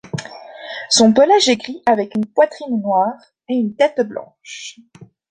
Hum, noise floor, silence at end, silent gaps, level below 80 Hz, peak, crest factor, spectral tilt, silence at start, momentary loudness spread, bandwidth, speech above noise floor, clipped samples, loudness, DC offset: none; -35 dBFS; 0.25 s; none; -60 dBFS; 0 dBFS; 16 dB; -3.5 dB/octave; 0.15 s; 21 LU; 9.6 kHz; 18 dB; under 0.1%; -16 LUFS; under 0.1%